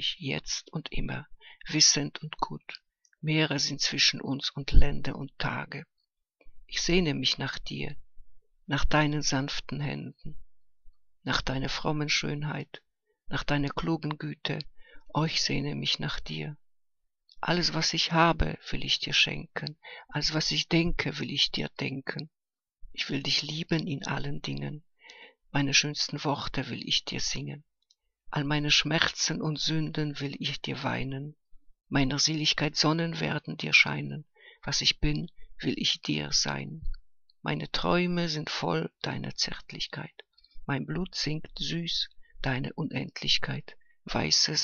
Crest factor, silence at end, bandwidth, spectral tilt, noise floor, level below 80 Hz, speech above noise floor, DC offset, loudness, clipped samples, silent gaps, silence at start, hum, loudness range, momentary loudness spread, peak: 28 dB; 0 s; 7.4 kHz; -3.5 dB/octave; -76 dBFS; -40 dBFS; 47 dB; under 0.1%; -29 LUFS; under 0.1%; none; 0 s; none; 6 LU; 14 LU; -2 dBFS